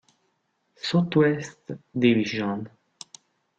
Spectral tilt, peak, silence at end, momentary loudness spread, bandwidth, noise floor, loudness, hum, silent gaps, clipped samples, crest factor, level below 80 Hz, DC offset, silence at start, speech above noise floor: -6.5 dB/octave; -6 dBFS; 0.9 s; 23 LU; 9 kHz; -73 dBFS; -24 LUFS; none; none; under 0.1%; 20 dB; -66 dBFS; under 0.1%; 0.85 s; 49 dB